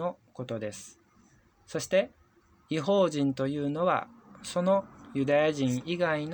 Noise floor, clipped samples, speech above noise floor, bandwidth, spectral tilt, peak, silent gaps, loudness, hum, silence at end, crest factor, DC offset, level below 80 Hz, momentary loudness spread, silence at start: -63 dBFS; under 0.1%; 35 dB; over 20 kHz; -5.5 dB/octave; -14 dBFS; none; -29 LUFS; none; 0 s; 16 dB; under 0.1%; -68 dBFS; 14 LU; 0 s